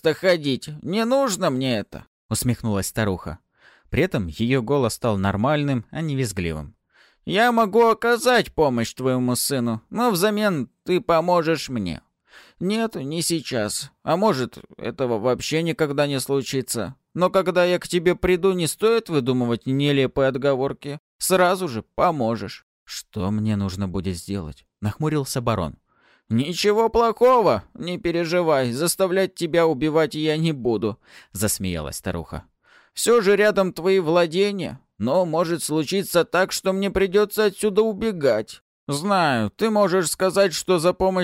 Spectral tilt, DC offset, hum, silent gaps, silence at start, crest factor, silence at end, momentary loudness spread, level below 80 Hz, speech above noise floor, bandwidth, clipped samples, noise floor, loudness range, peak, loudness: -5 dB/octave; under 0.1%; none; 2.07-2.29 s, 20.99-21.19 s, 22.63-22.86 s, 38.61-38.87 s; 0.05 s; 16 dB; 0 s; 11 LU; -48 dBFS; 38 dB; 16 kHz; under 0.1%; -59 dBFS; 4 LU; -6 dBFS; -22 LUFS